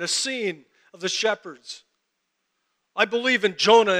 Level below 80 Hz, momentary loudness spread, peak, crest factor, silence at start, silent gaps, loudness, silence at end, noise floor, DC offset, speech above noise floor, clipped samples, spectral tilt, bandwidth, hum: -82 dBFS; 21 LU; -4 dBFS; 20 dB; 0 s; none; -22 LUFS; 0 s; -77 dBFS; under 0.1%; 55 dB; under 0.1%; -2 dB/octave; 13.5 kHz; none